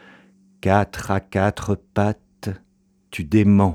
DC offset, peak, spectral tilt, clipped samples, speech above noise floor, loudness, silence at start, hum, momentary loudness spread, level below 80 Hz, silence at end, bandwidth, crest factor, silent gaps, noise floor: under 0.1%; -2 dBFS; -7.5 dB/octave; under 0.1%; 43 dB; -22 LUFS; 0.65 s; none; 15 LU; -46 dBFS; 0 s; 14 kHz; 20 dB; none; -61 dBFS